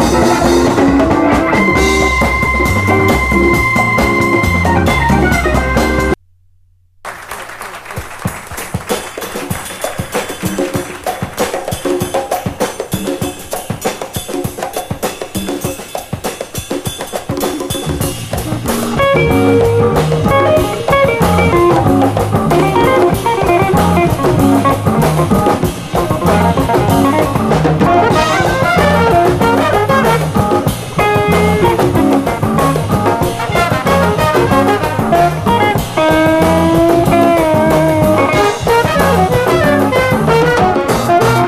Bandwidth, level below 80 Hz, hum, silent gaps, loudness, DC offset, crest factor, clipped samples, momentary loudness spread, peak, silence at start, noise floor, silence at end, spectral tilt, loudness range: 15.5 kHz; -28 dBFS; none; none; -12 LUFS; under 0.1%; 12 dB; under 0.1%; 11 LU; 0 dBFS; 0 s; -49 dBFS; 0 s; -5.5 dB/octave; 9 LU